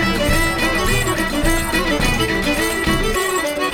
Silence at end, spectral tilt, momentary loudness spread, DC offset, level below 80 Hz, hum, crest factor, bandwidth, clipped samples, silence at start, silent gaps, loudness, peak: 0 s; -3.5 dB/octave; 2 LU; under 0.1%; -26 dBFS; none; 14 dB; 19.5 kHz; under 0.1%; 0 s; none; -17 LUFS; -4 dBFS